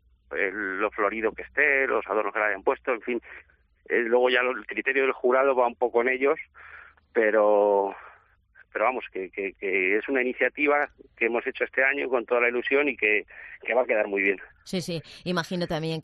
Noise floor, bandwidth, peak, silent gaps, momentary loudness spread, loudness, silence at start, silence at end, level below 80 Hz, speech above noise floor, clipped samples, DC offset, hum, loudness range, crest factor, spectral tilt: -58 dBFS; 11.5 kHz; -8 dBFS; none; 11 LU; -25 LUFS; 0.3 s; 0 s; -62 dBFS; 33 dB; under 0.1%; under 0.1%; none; 2 LU; 18 dB; -5.5 dB/octave